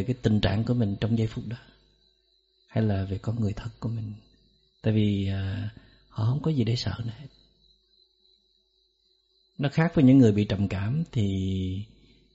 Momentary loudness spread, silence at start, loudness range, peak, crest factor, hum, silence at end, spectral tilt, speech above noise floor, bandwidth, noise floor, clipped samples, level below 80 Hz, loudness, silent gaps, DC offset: 17 LU; 0 s; 8 LU; -8 dBFS; 20 dB; none; 0.5 s; -7.5 dB/octave; 44 dB; 7.8 kHz; -69 dBFS; under 0.1%; -50 dBFS; -26 LUFS; none; under 0.1%